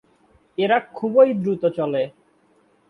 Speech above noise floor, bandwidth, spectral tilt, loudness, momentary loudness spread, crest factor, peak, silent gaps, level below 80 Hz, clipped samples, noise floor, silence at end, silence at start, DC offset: 41 dB; 4.5 kHz; -8.5 dB/octave; -20 LUFS; 10 LU; 18 dB; -4 dBFS; none; -68 dBFS; under 0.1%; -60 dBFS; 0.8 s; 0.6 s; under 0.1%